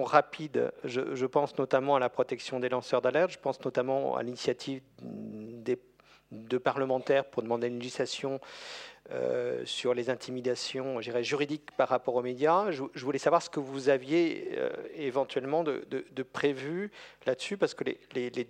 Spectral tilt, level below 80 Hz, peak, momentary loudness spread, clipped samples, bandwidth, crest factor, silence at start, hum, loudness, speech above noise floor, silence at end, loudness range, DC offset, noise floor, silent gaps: -5 dB/octave; -76 dBFS; -6 dBFS; 11 LU; under 0.1%; 10.5 kHz; 24 dB; 0 s; none; -31 LUFS; 30 dB; 0.05 s; 4 LU; under 0.1%; -61 dBFS; none